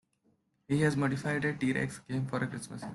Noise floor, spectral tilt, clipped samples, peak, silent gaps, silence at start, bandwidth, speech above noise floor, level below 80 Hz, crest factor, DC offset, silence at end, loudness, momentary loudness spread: -73 dBFS; -6.5 dB/octave; under 0.1%; -16 dBFS; none; 0.7 s; 12 kHz; 42 dB; -64 dBFS; 16 dB; under 0.1%; 0 s; -32 LUFS; 7 LU